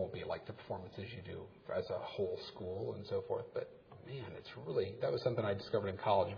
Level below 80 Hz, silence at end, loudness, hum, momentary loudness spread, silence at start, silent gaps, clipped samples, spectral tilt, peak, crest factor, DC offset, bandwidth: -72 dBFS; 0 s; -41 LUFS; none; 12 LU; 0 s; none; under 0.1%; -5 dB/octave; -20 dBFS; 20 dB; under 0.1%; 5.4 kHz